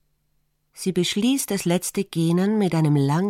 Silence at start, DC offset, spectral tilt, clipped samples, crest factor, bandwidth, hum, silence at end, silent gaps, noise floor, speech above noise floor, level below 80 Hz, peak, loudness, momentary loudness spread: 0.75 s; under 0.1%; -5.5 dB/octave; under 0.1%; 14 dB; 16.5 kHz; none; 0 s; none; -68 dBFS; 48 dB; -62 dBFS; -8 dBFS; -22 LUFS; 5 LU